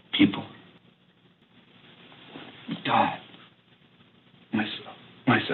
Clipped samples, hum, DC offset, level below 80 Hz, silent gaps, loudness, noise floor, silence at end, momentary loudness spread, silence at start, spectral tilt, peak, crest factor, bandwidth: under 0.1%; none; under 0.1%; -70 dBFS; none; -27 LUFS; -61 dBFS; 0 s; 23 LU; 0.15 s; -9 dB/octave; -8 dBFS; 22 dB; 4.4 kHz